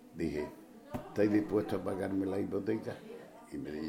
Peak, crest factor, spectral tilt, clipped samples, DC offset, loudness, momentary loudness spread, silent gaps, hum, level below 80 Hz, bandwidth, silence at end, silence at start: -16 dBFS; 18 dB; -7.5 dB/octave; under 0.1%; under 0.1%; -35 LUFS; 16 LU; none; none; -62 dBFS; 16.5 kHz; 0 s; 0 s